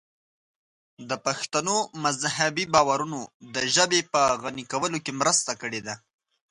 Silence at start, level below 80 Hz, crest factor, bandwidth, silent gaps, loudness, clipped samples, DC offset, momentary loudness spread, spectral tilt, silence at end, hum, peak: 1 s; -64 dBFS; 22 dB; 11.5 kHz; 3.34-3.40 s; -25 LUFS; under 0.1%; under 0.1%; 12 LU; -2 dB/octave; 0.55 s; none; -4 dBFS